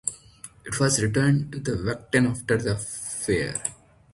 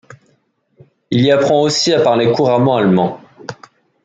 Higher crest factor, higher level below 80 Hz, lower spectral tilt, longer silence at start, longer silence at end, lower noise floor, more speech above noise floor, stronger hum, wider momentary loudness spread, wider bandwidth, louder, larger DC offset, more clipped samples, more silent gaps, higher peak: first, 20 dB vs 14 dB; first, -48 dBFS vs -58 dBFS; about the same, -4.5 dB/octave vs -5.5 dB/octave; about the same, 0.05 s vs 0.1 s; about the same, 0.4 s vs 0.5 s; second, -48 dBFS vs -60 dBFS; second, 23 dB vs 48 dB; neither; second, 11 LU vs 19 LU; first, 11.5 kHz vs 9.4 kHz; second, -25 LUFS vs -13 LUFS; neither; neither; neither; second, -6 dBFS vs -2 dBFS